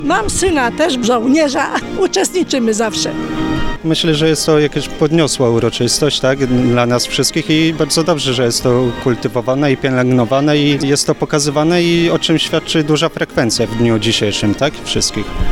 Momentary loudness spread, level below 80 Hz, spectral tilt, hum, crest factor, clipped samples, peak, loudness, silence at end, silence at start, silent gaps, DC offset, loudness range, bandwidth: 4 LU; -32 dBFS; -4.5 dB/octave; none; 12 dB; under 0.1%; -2 dBFS; -14 LUFS; 0 s; 0 s; none; under 0.1%; 2 LU; 17 kHz